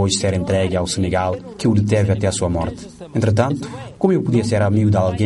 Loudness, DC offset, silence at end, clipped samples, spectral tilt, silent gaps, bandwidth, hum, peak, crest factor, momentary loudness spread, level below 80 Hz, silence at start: -18 LUFS; under 0.1%; 0 s; under 0.1%; -6 dB/octave; none; 11.5 kHz; none; -4 dBFS; 14 dB; 8 LU; -40 dBFS; 0 s